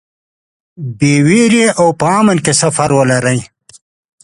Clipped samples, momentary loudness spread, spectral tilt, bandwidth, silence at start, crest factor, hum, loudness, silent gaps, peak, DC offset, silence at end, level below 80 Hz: under 0.1%; 8 LU; -5 dB/octave; 11.5 kHz; 0.8 s; 12 dB; none; -11 LUFS; none; 0 dBFS; under 0.1%; 0.8 s; -48 dBFS